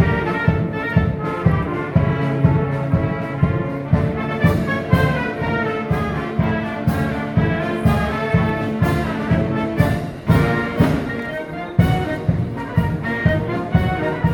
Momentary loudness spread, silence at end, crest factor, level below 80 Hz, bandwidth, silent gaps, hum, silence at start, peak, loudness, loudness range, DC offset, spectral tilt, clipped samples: 4 LU; 0 s; 18 dB; -32 dBFS; 19 kHz; none; none; 0 s; 0 dBFS; -19 LUFS; 1 LU; under 0.1%; -8 dB/octave; under 0.1%